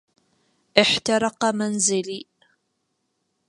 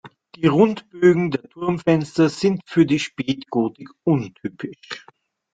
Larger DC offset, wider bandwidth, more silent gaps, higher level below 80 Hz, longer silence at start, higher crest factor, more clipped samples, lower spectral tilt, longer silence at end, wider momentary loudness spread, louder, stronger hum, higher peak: neither; first, 11.5 kHz vs 9 kHz; neither; about the same, -64 dBFS vs -60 dBFS; first, 0.75 s vs 0.05 s; first, 24 dB vs 18 dB; neither; second, -2.5 dB/octave vs -7 dB/octave; first, 1.25 s vs 0.55 s; second, 11 LU vs 15 LU; about the same, -21 LUFS vs -20 LUFS; neither; about the same, 0 dBFS vs -2 dBFS